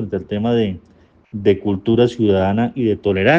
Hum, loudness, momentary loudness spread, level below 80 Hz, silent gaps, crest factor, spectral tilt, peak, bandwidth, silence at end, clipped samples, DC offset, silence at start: none; -18 LUFS; 8 LU; -50 dBFS; none; 16 dB; -8 dB/octave; 0 dBFS; 7.8 kHz; 0 s; under 0.1%; under 0.1%; 0 s